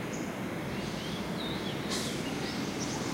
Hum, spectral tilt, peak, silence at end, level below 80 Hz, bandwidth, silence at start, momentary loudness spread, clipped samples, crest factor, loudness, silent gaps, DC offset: none; -4 dB/octave; -20 dBFS; 0 s; -56 dBFS; 16 kHz; 0 s; 3 LU; under 0.1%; 14 dB; -35 LUFS; none; under 0.1%